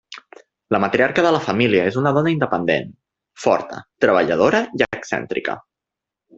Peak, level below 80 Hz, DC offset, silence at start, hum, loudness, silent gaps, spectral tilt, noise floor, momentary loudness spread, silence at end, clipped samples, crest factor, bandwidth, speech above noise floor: -2 dBFS; -56 dBFS; under 0.1%; 0.1 s; none; -19 LUFS; none; -6 dB/octave; -85 dBFS; 11 LU; 0.8 s; under 0.1%; 18 dB; 8 kHz; 67 dB